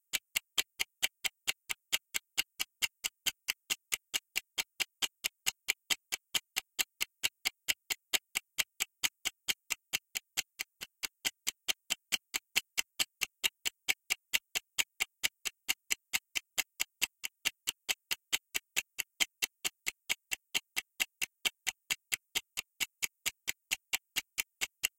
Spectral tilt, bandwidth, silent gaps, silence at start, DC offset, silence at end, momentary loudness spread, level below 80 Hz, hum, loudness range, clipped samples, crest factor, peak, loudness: 2.5 dB/octave; 17 kHz; none; 0.15 s; under 0.1%; 0.1 s; 5 LU; -74 dBFS; none; 2 LU; under 0.1%; 30 dB; -10 dBFS; -35 LUFS